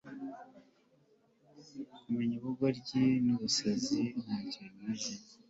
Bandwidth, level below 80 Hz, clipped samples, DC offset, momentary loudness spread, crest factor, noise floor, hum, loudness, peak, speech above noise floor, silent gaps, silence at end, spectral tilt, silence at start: 8 kHz; -72 dBFS; under 0.1%; under 0.1%; 18 LU; 18 dB; -69 dBFS; none; -34 LUFS; -18 dBFS; 35 dB; none; 0.15 s; -4.5 dB/octave; 0.05 s